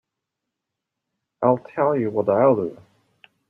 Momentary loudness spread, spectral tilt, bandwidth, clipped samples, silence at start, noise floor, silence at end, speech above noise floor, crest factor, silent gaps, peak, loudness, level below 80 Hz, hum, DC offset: 6 LU; -10.5 dB/octave; 3.8 kHz; under 0.1%; 1.4 s; -83 dBFS; 0.75 s; 63 dB; 20 dB; none; -4 dBFS; -21 LUFS; -68 dBFS; none; under 0.1%